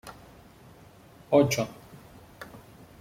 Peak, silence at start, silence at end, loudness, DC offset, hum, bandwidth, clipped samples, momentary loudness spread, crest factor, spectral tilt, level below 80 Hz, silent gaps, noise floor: -8 dBFS; 0.05 s; 0.45 s; -25 LUFS; under 0.1%; none; 16.5 kHz; under 0.1%; 27 LU; 22 dB; -5.5 dB/octave; -60 dBFS; none; -53 dBFS